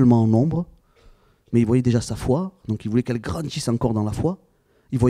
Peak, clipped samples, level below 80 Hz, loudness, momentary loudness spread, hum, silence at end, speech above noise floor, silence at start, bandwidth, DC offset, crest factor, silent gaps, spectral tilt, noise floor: -6 dBFS; under 0.1%; -44 dBFS; -22 LUFS; 10 LU; none; 0 s; 33 dB; 0 s; 13 kHz; under 0.1%; 16 dB; none; -7.5 dB/octave; -53 dBFS